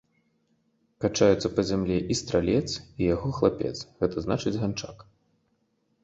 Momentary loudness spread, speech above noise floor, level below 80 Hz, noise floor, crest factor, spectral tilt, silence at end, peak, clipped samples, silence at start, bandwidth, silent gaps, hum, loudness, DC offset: 10 LU; 46 dB; -48 dBFS; -72 dBFS; 20 dB; -5.5 dB/octave; 1 s; -8 dBFS; under 0.1%; 1 s; 8.2 kHz; none; none; -27 LUFS; under 0.1%